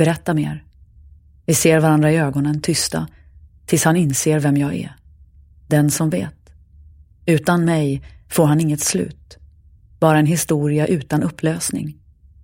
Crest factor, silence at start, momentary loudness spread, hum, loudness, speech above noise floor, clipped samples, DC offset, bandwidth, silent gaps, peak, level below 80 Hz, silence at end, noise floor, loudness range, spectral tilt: 18 dB; 0 s; 13 LU; none; -18 LUFS; 31 dB; under 0.1%; under 0.1%; 16.5 kHz; none; -2 dBFS; -48 dBFS; 0.5 s; -48 dBFS; 3 LU; -5.5 dB/octave